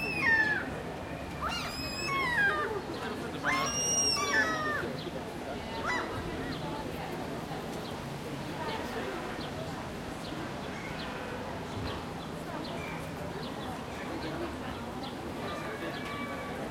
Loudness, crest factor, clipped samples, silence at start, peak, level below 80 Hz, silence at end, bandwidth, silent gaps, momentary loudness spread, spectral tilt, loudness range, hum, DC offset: -33 LUFS; 20 dB; under 0.1%; 0 s; -16 dBFS; -54 dBFS; 0 s; 16.5 kHz; none; 12 LU; -3 dB/octave; 9 LU; none; under 0.1%